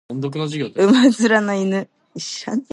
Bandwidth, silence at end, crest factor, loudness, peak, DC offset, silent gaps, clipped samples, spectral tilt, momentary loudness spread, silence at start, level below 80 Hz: 11.5 kHz; 0.1 s; 16 dB; -18 LUFS; -2 dBFS; under 0.1%; none; under 0.1%; -5 dB/octave; 15 LU; 0.1 s; -70 dBFS